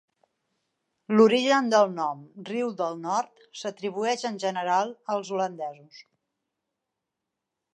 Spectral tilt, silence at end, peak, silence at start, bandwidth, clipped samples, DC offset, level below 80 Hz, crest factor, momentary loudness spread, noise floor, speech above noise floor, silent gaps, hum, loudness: -4.5 dB/octave; 1.75 s; -6 dBFS; 1.1 s; 11 kHz; under 0.1%; under 0.1%; -84 dBFS; 22 dB; 16 LU; -85 dBFS; 59 dB; none; none; -26 LUFS